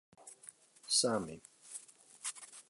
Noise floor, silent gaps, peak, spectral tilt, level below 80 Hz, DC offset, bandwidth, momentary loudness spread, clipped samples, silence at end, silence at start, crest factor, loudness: -59 dBFS; none; -18 dBFS; -2 dB/octave; -76 dBFS; under 0.1%; 12 kHz; 24 LU; under 0.1%; 0.1 s; 0.2 s; 22 dB; -35 LUFS